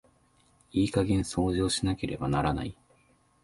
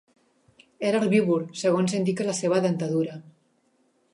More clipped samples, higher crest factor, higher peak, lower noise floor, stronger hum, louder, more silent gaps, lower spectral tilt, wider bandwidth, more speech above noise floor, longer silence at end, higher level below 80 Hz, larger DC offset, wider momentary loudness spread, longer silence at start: neither; about the same, 18 dB vs 18 dB; second, -12 dBFS vs -8 dBFS; about the same, -65 dBFS vs -67 dBFS; neither; second, -29 LUFS vs -25 LUFS; neither; about the same, -5.5 dB/octave vs -6 dB/octave; about the same, 11.5 kHz vs 11.5 kHz; second, 37 dB vs 43 dB; second, 0.7 s vs 0.85 s; first, -44 dBFS vs -72 dBFS; neither; about the same, 6 LU vs 7 LU; about the same, 0.75 s vs 0.8 s